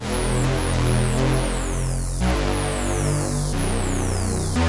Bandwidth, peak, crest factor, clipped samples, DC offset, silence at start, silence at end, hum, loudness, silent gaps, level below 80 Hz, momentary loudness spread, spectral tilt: 11.5 kHz; -8 dBFS; 12 dB; under 0.1%; 0.2%; 0 s; 0 s; none; -23 LUFS; none; -26 dBFS; 4 LU; -5 dB/octave